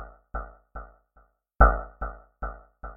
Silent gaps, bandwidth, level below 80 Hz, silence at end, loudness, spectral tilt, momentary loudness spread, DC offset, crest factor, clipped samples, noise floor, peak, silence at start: none; 2.1 kHz; -30 dBFS; 0 s; -27 LUFS; -11.5 dB/octave; 24 LU; under 0.1%; 26 dB; under 0.1%; -63 dBFS; -4 dBFS; 0 s